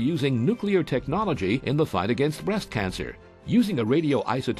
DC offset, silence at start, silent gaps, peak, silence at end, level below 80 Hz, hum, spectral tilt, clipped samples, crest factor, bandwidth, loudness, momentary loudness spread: under 0.1%; 0 s; none; -10 dBFS; 0 s; -48 dBFS; none; -7 dB/octave; under 0.1%; 14 dB; 13 kHz; -25 LUFS; 6 LU